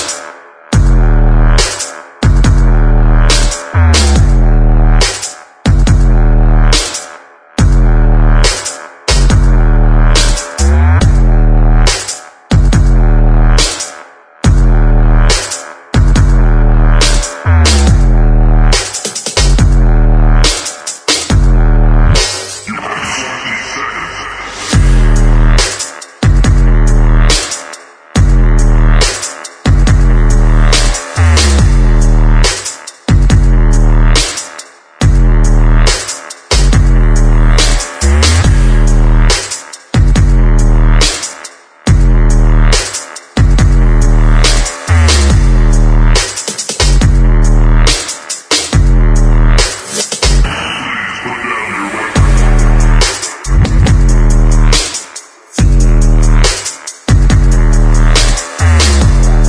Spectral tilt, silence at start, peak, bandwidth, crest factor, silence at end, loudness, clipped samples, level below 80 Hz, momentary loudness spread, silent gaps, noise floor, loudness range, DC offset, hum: -4.5 dB/octave; 0 s; 0 dBFS; 11 kHz; 8 dB; 0 s; -11 LUFS; 0.1%; -8 dBFS; 9 LU; none; -34 dBFS; 2 LU; under 0.1%; none